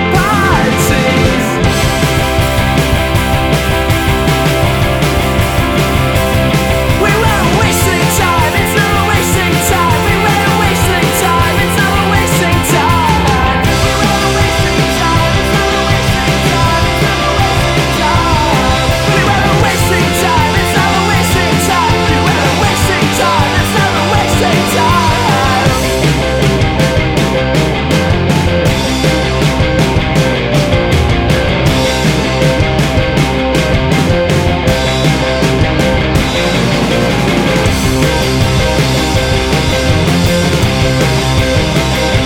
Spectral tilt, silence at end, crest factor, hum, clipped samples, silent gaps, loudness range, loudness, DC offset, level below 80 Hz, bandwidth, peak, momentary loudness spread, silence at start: -5 dB/octave; 0 s; 10 dB; none; under 0.1%; none; 1 LU; -11 LUFS; under 0.1%; -20 dBFS; over 20 kHz; 0 dBFS; 2 LU; 0 s